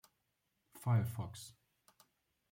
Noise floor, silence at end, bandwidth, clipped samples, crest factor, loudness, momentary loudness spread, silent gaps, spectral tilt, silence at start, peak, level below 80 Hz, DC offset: -84 dBFS; 1 s; 16.5 kHz; under 0.1%; 18 dB; -38 LUFS; 18 LU; none; -6.5 dB/octave; 0.75 s; -24 dBFS; -74 dBFS; under 0.1%